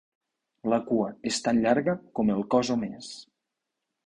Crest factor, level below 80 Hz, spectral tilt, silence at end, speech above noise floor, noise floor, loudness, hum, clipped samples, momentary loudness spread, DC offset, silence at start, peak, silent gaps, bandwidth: 20 dB; -62 dBFS; -5 dB/octave; 0.85 s; 58 dB; -84 dBFS; -27 LUFS; none; under 0.1%; 13 LU; under 0.1%; 0.65 s; -8 dBFS; none; 11 kHz